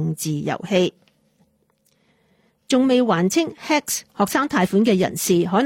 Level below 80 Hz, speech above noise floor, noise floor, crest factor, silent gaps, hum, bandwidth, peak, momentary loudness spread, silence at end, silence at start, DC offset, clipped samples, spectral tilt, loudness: -60 dBFS; 45 dB; -64 dBFS; 16 dB; none; none; 16.5 kHz; -6 dBFS; 7 LU; 0 s; 0 s; under 0.1%; under 0.1%; -5 dB/octave; -20 LUFS